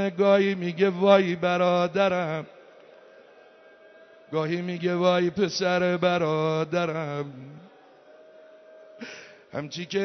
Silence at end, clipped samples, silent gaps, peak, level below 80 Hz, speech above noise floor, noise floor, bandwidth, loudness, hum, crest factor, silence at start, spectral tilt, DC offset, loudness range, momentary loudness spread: 0 s; under 0.1%; none; -6 dBFS; -70 dBFS; 29 dB; -53 dBFS; 6.4 kHz; -24 LUFS; none; 20 dB; 0 s; -6 dB/octave; under 0.1%; 7 LU; 20 LU